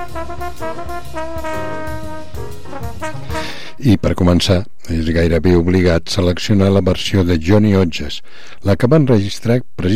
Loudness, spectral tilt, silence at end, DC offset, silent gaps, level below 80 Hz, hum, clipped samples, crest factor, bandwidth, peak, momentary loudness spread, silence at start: -16 LUFS; -6.5 dB/octave; 0 s; 7%; none; -32 dBFS; none; under 0.1%; 14 dB; 15 kHz; -2 dBFS; 15 LU; 0 s